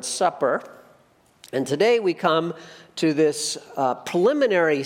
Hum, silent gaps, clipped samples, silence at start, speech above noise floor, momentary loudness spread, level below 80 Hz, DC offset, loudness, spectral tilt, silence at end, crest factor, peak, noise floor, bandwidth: none; none; under 0.1%; 0 s; 36 dB; 10 LU; -74 dBFS; under 0.1%; -22 LUFS; -4 dB/octave; 0 s; 18 dB; -6 dBFS; -58 dBFS; 16 kHz